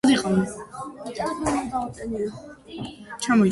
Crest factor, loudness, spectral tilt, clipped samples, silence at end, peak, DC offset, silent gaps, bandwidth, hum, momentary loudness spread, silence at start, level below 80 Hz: 16 dB; -26 LUFS; -5 dB/octave; under 0.1%; 0 s; -8 dBFS; under 0.1%; none; 11.5 kHz; none; 16 LU; 0.05 s; -50 dBFS